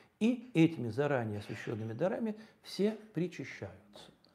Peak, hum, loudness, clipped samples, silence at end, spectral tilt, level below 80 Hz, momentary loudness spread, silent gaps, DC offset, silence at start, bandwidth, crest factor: -14 dBFS; none; -35 LUFS; under 0.1%; 0.3 s; -7 dB/octave; -78 dBFS; 16 LU; none; under 0.1%; 0.2 s; 13 kHz; 20 dB